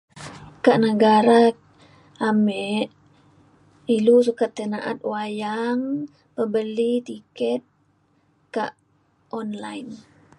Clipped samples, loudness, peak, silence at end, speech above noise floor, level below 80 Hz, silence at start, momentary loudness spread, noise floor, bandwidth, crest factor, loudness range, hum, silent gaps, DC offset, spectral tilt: under 0.1%; -22 LUFS; -2 dBFS; 0.4 s; 43 dB; -68 dBFS; 0.15 s; 19 LU; -63 dBFS; 11.5 kHz; 20 dB; 9 LU; none; none; under 0.1%; -6 dB/octave